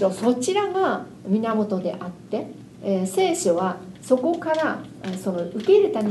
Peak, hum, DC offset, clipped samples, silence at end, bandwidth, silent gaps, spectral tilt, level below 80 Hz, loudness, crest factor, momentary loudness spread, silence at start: -6 dBFS; none; under 0.1%; under 0.1%; 0 s; 12.5 kHz; none; -5.5 dB/octave; -64 dBFS; -23 LUFS; 18 dB; 12 LU; 0 s